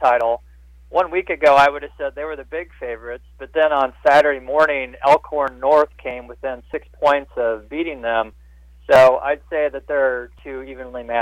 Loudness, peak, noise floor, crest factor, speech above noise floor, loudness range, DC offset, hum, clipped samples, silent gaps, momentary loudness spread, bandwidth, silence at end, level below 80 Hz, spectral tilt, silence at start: -18 LUFS; -6 dBFS; -45 dBFS; 14 dB; 26 dB; 3 LU; under 0.1%; none; under 0.1%; none; 17 LU; 12.5 kHz; 0 s; -46 dBFS; -5 dB/octave; 0 s